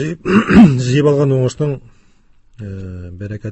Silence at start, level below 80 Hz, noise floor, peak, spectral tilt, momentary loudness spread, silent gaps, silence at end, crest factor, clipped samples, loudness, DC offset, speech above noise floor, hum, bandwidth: 0 s; -36 dBFS; -48 dBFS; 0 dBFS; -7.5 dB/octave; 21 LU; none; 0 s; 14 dB; 0.5%; -12 LUFS; under 0.1%; 35 dB; none; 8.4 kHz